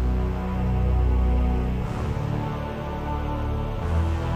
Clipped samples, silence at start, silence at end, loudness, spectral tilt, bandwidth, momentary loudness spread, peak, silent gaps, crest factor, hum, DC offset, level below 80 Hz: under 0.1%; 0 s; 0 s; -26 LUFS; -8.5 dB/octave; 7.6 kHz; 7 LU; -12 dBFS; none; 12 dB; none; under 0.1%; -26 dBFS